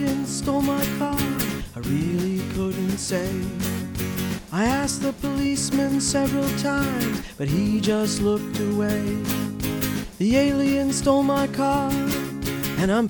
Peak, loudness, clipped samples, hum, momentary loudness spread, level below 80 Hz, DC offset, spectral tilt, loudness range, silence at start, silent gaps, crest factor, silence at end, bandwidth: -6 dBFS; -23 LUFS; under 0.1%; none; 7 LU; -42 dBFS; under 0.1%; -5 dB/octave; 3 LU; 0 s; none; 18 dB; 0 s; over 20 kHz